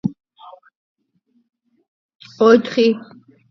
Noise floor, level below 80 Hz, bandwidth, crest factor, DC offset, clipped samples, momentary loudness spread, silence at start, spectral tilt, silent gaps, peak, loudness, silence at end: -64 dBFS; -66 dBFS; 6.4 kHz; 20 dB; under 0.1%; under 0.1%; 14 LU; 0.05 s; -6 dB/octave; 0.75-0.96 s, 1.88-2.09 s, 2.15-2.19 s; 0 dBFS; -16 LUFS; 0.5 s